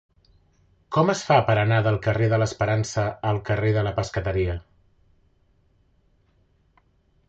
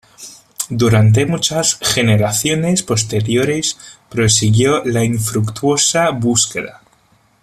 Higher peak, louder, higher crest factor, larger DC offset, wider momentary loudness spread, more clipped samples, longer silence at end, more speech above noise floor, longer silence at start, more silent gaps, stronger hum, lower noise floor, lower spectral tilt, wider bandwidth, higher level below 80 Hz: second, -6 dBFS vs 0 dBFS; second, -23 LUFS vs -14 LUFS; about the same, 18 dB vs 14 dB; neither; second, 8 LU vs 13 LU; neither; first, 2.7 s vs 0.7 s; about the same, 41 dB vs 40 dB; first, 0.9 s vs 0.2 s; neither; neither; first, -63 dBFS vs -54 dBFS; first, -6 dB/octave vs -4 dB/octave; second, 8 kHz vs 14.5 kHz; about the same, -44 dBFS vs -44 dBFS